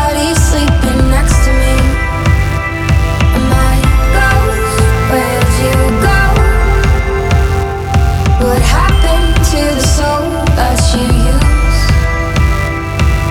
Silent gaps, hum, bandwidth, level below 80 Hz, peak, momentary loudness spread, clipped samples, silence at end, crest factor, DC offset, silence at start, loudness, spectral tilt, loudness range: none; none; 16.5 kHz; -12 dBFS; 0 dBFS; 3 LU; under 0.1%; 0 s; 10 dB; under 0.1%; 0 s; -11 LUFS; -5 dB/octave; 1 LU